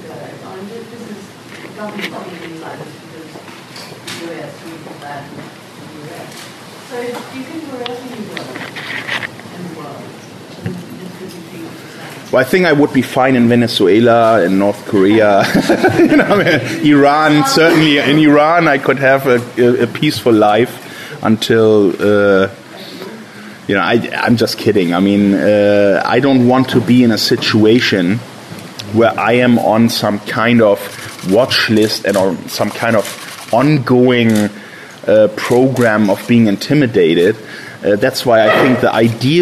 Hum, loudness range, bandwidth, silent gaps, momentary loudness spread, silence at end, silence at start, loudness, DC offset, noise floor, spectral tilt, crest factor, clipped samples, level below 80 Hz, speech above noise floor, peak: none; 18 LU; 13.5 kHz; none; 21 LU; 0 s; 0 s; -11 LUFS; under 0.1%; -33 dBFS; -5.5 dB/octave; 12 dB; under 0.1%; -52 dBFS; 21 dB; 0 dBFS